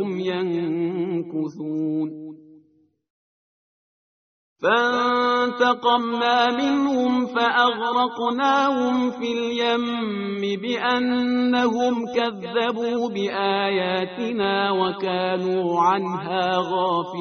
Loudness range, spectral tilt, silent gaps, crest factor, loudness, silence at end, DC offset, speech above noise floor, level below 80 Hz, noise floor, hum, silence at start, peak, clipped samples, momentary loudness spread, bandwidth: 8 LU; -2.5 dB/octave; 3.10-4.56 s; 18 dB; -22 LUFS; 0 s; under 0.1%; 39 dB; -66 dBFS; -61 dBFS; none; 0 s; -4 dBFS; under 0.1%; 7 LU; 6.6 kHz